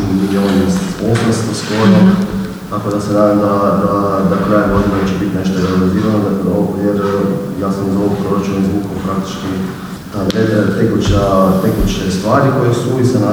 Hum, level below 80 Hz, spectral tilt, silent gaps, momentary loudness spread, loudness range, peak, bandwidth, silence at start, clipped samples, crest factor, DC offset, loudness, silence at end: none; -32 dBFS; -7 dB/octave; none; 8 LU; 3 LU; 0 dBFS; over 20 kHz; 0 s; under 0.1%; 12 dB; under 0.1%; -14 LUFS; 0 s